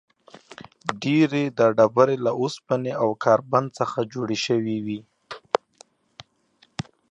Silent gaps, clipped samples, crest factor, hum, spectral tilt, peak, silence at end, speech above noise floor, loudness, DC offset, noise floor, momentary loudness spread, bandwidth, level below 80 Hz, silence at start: none; under 0.1%; 24 dB; none; -6 dB/octave; 0 dBFS; 1.75 s; 40 dB; -23 LUFS; under 0.1%; -62 dBFS; 18 LU; 9.8 kHz; -66 dBFS; 0.6 s